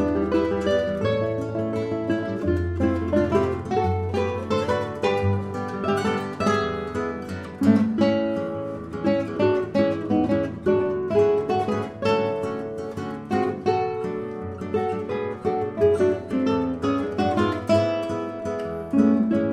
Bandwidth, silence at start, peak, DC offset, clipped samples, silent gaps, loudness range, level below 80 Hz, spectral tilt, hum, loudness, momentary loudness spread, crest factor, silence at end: 12 kHz; 0 s; -6 dBFS; under 0.1%; under 0.1%; none; 3 LU; -48 dBFS; -7.5 dB/octave; none; -24 LUFS; 9 LU; 18 dB; 0 s